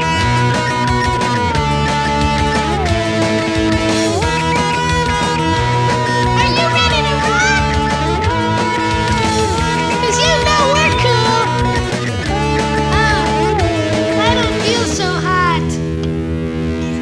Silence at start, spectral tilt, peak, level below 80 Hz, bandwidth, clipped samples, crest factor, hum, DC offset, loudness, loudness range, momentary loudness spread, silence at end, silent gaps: 0 s; -4.5 dB/octave; 0 dBFS; -26 dBFS; 11 kHz; under 0.1%; 14 dB; none; 0.3%; -14 LUFS; 2 LU; 5 LU; 0 s; none